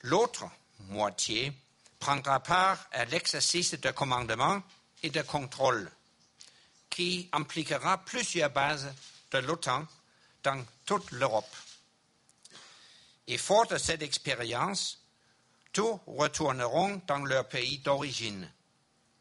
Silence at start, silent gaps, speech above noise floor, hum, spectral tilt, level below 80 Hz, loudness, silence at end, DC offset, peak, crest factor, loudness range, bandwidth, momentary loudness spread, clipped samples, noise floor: 0.05 s; none; 39 dB; none; -3 dB/octave; -64 dBFS; -31 LUFS; 0.7 s; under 0.1%; -10 dBFS; 22 dB; 5 LU; 11.5 kHz; 15 LU; under 0.1%; -70 dBFS